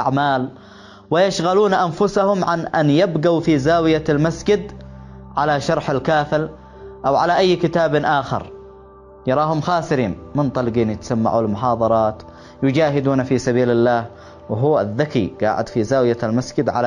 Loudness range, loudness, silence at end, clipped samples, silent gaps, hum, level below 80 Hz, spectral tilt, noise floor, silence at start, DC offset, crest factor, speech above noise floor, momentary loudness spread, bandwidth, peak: 3 LU; -18 LUFS; 0 s; under 0.1%; none; none; -46 dBFS; -6.5 dB/octave; -42 dBFS; 0 s; under 0.1%; 14 dB; 25 dB; 7 LU; 11 kHz; -4 dBFS